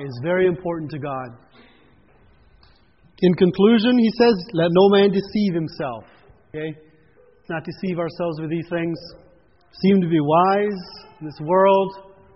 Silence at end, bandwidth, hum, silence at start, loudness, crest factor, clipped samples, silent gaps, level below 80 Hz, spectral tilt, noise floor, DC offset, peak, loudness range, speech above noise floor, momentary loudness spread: 0.35 s; 5.8 kHz; none; 0 s; -20 LUFS; 18 dB; under 0.1%; none; -56 dBFS; -5.5 dB/octave; -55 dBFS; under 0.1%; -4 dBFS; 11 LU; 36 dB; 17 LU